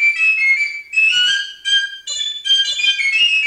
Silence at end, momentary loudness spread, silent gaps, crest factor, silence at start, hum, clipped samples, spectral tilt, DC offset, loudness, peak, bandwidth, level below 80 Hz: 0 s; 8 LU; none; 12 dB; 0 s; none; under 0.1%; 4.5 dB/octave; under 0.1%; -14 LUFS; -4 dBFS; 15.5 kHz; -64 dBFS